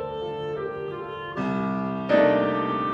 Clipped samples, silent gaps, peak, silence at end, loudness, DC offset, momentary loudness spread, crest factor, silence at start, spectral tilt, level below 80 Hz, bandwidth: under 0.1%; none; -6 dBFS; 0 s; -25 LUFS; under 0.1%; 13 LU; 18 dB; 0 s; -8 dB/octave; -56 dBFS; 7.4 kHz